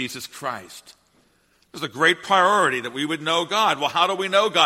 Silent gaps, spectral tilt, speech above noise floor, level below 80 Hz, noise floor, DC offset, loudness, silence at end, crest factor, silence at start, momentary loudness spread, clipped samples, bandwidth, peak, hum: none; -2.5 dB/octave; 41 dB; -70 dBFS; -62 dBFS; under 0.1%; -20 LUFS; 0 s; 20 dB; 0 s; 15 LU; under 0.1%; 16.5 kHz; -2 dBFS; none